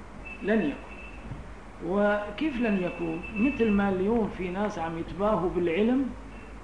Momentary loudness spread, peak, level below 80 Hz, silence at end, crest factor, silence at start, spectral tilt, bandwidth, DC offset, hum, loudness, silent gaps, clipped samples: 17 LU; -14 dBFS; -46 dBFS; 0 s; 14 dB; 0 s; -7.5 dB/octave; 10 kHz; 0.3%; none; -28 LUFS; none; under 0.1%